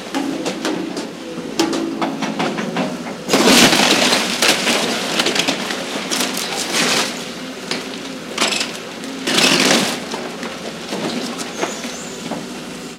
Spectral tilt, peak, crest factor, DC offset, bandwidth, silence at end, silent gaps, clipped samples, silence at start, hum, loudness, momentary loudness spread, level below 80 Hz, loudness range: -2 dB/octave; -2 dBFS; 18 dB; under 0.1%; 17 kHz; 0 s; none; under 0.1%; 0 s; none; -17 LUFS; 15 LU; -54 dBFS; 6 LU